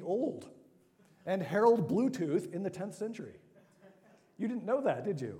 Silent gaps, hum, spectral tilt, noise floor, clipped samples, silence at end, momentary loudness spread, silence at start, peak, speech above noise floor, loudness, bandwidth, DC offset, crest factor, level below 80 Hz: none; none; -7.5 dB/octave; -65 dBFS; under 0.1%; 0 s; 16 LU; 0 s; -14 dBFS; 33 dB; -33 LUFS; 15 kHz; under 0.1%; 20 dB; -80 dBFS